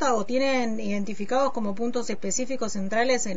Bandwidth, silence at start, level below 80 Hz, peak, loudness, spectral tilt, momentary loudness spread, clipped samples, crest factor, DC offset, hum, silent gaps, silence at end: 8 kHz; 0 s; -60 dBFS; -10 dBFS; -27 LUFS; -4 dB/octave; 6 LU; under 0.1%; 14 dB; 4%; none; none; 0 s